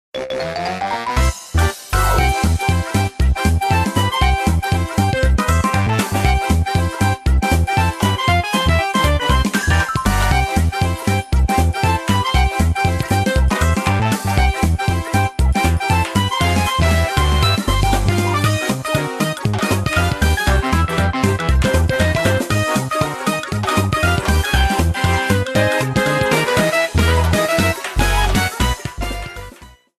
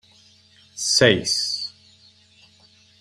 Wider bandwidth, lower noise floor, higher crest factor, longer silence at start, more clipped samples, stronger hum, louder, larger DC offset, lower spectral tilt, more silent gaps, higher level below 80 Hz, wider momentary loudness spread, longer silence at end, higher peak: about the same, 15 kHz vs 15.5 kHz; second, -41 dBFS vs -55 dBFS; second, 16 dB vs 24 dB; second, 0.15 s vs 0.75 s; neither; neither; about the same, -17 LUFS vs -19 LUFS; neither; first, -5 dB/octave vs -2.5 dB/octave; neither; first, -22 dBFS vs -58 dBFS; second, 4 LU vs 16 LU; second, 0.3 s vs 1.3 s; about the same, 0 dBFS vs 0 dBFS